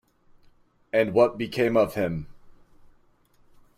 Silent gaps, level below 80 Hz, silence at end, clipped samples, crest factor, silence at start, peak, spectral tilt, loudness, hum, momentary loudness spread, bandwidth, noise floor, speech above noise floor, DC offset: none; -56 dBFS; 1.25 s; under 0.1%; 20 dB; 0.95 s; -8 dBFS; -7 dB/octave; -24 LUFS; 60 Hz at -50 dBFS; 11 LU; 15.5 kHz; -60 dBFS; 37 dB; under 0.1%